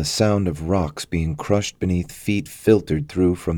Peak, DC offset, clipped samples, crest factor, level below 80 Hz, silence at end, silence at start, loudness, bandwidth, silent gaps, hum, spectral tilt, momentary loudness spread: -4 dBFS; under 0.1%; under 0.1%; 18 dB; -38 dBFS; 0 s; 0 s; -21 LUFS; 19 kHz; none; none; -6 dB/octave; 6 LU